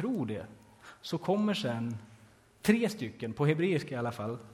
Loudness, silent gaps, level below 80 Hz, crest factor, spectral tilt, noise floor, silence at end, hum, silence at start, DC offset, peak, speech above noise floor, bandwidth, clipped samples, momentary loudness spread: -32 LUFS; none; -66 dBFS; 20 dB; -6.5 dB/octave; -59 dBFS; 0 s; none; 0 s; under 0.1%; -12 dBFS; 28 dB; 16 kHz; under 0.1%; 12 LU